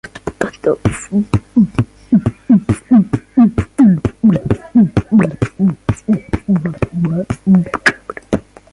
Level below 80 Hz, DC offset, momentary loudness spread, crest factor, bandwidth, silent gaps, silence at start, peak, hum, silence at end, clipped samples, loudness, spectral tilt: -34 dBFS; under 0.1%; 9 LU; 14 dB; 11.5 kHz; none; 0.05 s; 0 dBFS; none; 0.3 s; under 0.1%; -15 LUFS; -7.5 dB/octave